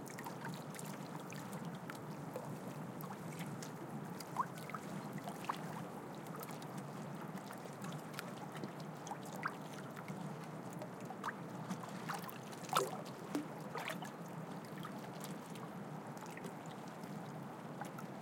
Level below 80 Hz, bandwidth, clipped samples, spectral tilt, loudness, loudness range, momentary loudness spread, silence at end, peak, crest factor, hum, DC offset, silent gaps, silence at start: -86 dBFS; 17 kHz; under 0.1%; -5 dB/octave; -46 LUFS; 4 LU; 5 LU; 0 s; -18 dBFS; 28 dB; none; under 0.1%; none; 0 s